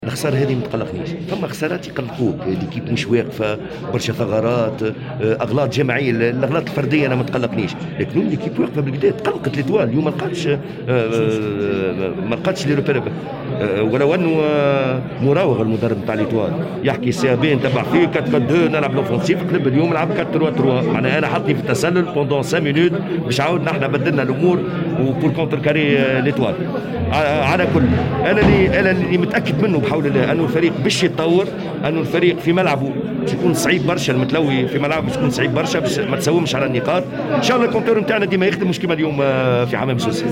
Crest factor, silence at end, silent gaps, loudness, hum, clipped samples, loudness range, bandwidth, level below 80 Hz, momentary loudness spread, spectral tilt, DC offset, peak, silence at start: 16 dB; 0 s; none; -18 LUFS; none; under 0.1%; 4 LU; 16.5 kHz; -46 dBFS; 6 LU; -6.5 dB/octave; under 0.1%; -2 dBFS; 0 s